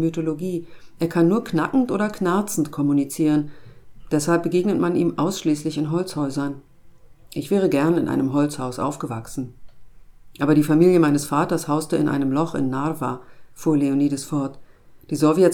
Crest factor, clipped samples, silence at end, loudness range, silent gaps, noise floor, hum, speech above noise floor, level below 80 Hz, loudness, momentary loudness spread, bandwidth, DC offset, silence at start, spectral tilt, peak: 18 dB; under 0.1%; 0 s; 4 LU; none; -46 dBFS; none; 25 dB; -52 dBFS; -21 LUFS; 12 LU; 18.5 kHz; under 0.1%; 0 s; -6.5 dB/octave; -4 dBFS